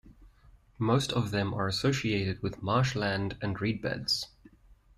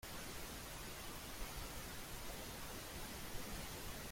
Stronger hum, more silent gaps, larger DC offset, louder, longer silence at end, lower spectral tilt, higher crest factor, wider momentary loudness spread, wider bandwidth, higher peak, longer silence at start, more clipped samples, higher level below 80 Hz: neither; neither; neither; first, -30 LUFS vs -49 LUFS; first, 0.7 s vs 0 s; first, -5.5 dB/octave vs -3 dB/octave; about the same, 18 dB vs 16 dB; first, 6 LU vs 1 LU; second, 13.5 kHz vs 16.5 kHz; first, -14 dBFS vs -34 dBFS; about the same, 0.05 s vs 0 s; neither; about the same, -54 dBFS vs -56 dBFS